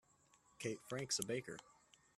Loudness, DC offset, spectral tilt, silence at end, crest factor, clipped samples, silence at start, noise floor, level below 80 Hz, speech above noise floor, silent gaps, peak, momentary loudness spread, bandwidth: -44 LUFS; under 0.1%; -3 dB/octave; 0.45 s; 24 dB; under 0.1%; 0.6 s; -73 dBFS; -80 dBFS; 29 dB; none; -24 dBFS; 13 LU; 15 kHz